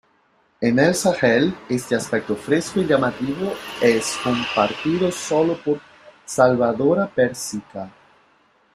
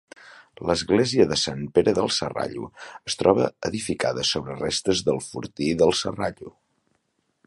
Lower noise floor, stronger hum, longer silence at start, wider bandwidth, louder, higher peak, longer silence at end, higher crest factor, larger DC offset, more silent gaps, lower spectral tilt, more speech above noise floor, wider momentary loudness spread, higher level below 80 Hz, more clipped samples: second, -61 dBFS vs -72 dBFS; neither; first, 0.6 s vs 0.25 s; first, 15 kHz vs 11.5 kHz; first, -20 LUFS vs -23 LUFS; about the same, -2 dBFS vs -2 dBFS; about the same, 0.85 s vs 0.95 s; about the same, 20 dB vs 22 dB; neither; neither; about the same, -5 dB/octave vs -4 dB/octave; second, 41 dB vs 49 dB; about the same, 10 LU vs 11 LU; second, -58 dBFS vs -52 dBFS; neither